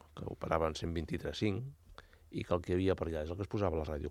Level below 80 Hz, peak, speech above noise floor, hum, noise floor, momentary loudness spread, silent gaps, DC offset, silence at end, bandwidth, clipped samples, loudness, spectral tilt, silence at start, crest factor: -50 dBFS; -14 dBFS; 22 dB; none; -57 dBFS; 11 LU; none; under 0.1%; 0 s; 14 kHz; under 0.1%; -37 LUFS; -7 dB/octave; 0.15 s; 22 dB